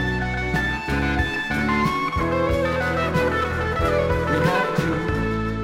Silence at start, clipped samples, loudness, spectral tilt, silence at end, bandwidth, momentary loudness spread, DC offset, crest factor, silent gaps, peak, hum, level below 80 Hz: 0 s; under 0.1%; -22 LUFS; -6.5 dB/octave; 0 s; 16 kHz; 3 LU; under 0.1%; 16 dB; none; -6 dBFS; none; -32 dBFS